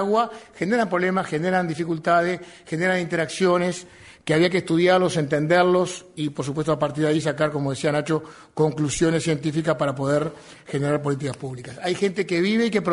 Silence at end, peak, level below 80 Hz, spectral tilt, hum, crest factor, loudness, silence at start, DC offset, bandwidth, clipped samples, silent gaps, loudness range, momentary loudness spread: 0 s; -6 dBFS; -56 dBFS; -5.5 dB/octave; none; 16 dB; -23 LUFS; 0 s; under 0.1%; 11 kHz; under 0.1%; none; 3 LU; 10 LU